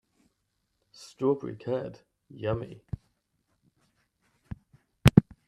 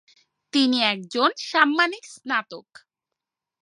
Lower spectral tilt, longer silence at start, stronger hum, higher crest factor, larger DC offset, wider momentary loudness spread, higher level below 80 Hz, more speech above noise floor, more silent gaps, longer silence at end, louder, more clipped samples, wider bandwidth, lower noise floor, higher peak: first, -7 dB/octave vs -3 dB/octave; first, 1 s vs 0.55 s; neither; first, 30 dB vs 24 dB; neither; first, 25 LU vs 14 LU; first, -48 dBFS vs -82 dBFS; second, 46 dB vs 63 dB; neither; second, 0.25 s vs 1 s; second, -28 LUFS vs -22 LUFS; neither; first, 13.5 kHz vs 11.5 kHz; second, -78 dBFS vs -86 dBFS; about the same, 0 dBFS vs -2 dBFS